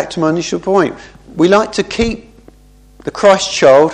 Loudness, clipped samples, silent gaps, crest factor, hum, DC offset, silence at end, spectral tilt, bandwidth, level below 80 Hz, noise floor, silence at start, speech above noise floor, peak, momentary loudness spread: -13 LUFS; 0.2%; none; 14 dB; 50 Hz at -45 dBFS; under 0.1%; 0 s; -4.5 dB/octave; 10 kHz; -38 dBFS; -44 dBFS; 0 s; 32 dB; 0 dBFS; 18 LU